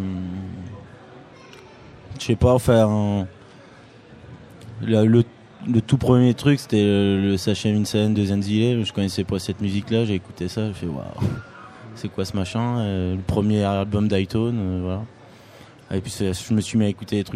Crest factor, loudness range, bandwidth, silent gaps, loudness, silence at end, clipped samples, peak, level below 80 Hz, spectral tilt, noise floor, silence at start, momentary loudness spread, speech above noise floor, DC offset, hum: 20 dB; 6 LU; 14.5 kHz; none; -22 LUFS; 0 s; under 0.1%; -2 dBFS; -46 dBFS; -7 dB/octave; -46 dBFS; 0 s; 16 LU; 26 dB; under 0.1%; none